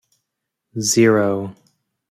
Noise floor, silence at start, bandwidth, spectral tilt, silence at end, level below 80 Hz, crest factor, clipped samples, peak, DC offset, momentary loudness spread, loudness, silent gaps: -80 dBFS; 0.75 s; 15.5 kHz; -4.5 dB/octave; 0.6 s; -62 dBFS; 18 dB; under 0.1%; -2 dBFS; under 0.1%; 19 LU; -17 LUFS; none